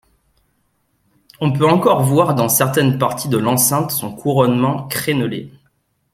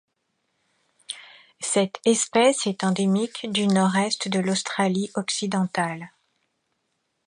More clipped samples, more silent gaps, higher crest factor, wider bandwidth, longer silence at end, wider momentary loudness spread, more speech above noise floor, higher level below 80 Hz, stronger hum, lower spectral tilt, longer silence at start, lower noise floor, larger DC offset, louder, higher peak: neither; neither; about the same, 16 dB vs 18 dB; first, 16.5 kHz vs 11 kHz; second, 0.65 s vs 1.2 s; second, 7 LU vs 17 LU; about the same, 49 dB vs 52 dB; first, -54 dBFS vs -72 dBFS; neither; about the same, -5 dB/octave vs -4 dB/octave; first, 1.4 s vs 1.1 s; second, -64 dBFS vs -75 dBFS; neither; first, -16 LUFS vs -23 LUFS; first, 0 dBFS vs -8 dBFS